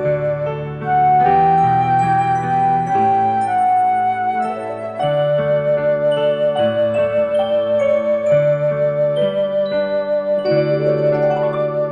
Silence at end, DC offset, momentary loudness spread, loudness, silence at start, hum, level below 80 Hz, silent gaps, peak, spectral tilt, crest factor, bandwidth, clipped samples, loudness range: 0 s; under 0.1%; 5 LU; -17 LUFS; 0 s; none; -52 dBFS; none; -4 dBFS; -7.5 dB/octave; 12 dB; 9.4 kHz; under 0.1%; 2 LU